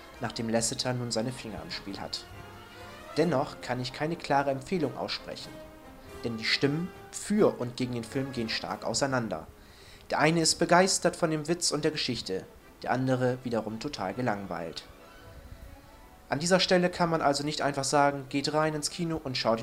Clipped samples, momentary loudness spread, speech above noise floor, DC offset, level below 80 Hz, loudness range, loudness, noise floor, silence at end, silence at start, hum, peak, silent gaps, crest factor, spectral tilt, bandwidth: under 0.1%; 15 LU; 23 dB; under 0.1%; -56 dBFS; 6 LU; -29 LUFS; -52 dBFS; 0 s; 0 s; none; -8 dBFS; none; 22 dB; -4 dB/octave; 16 kHz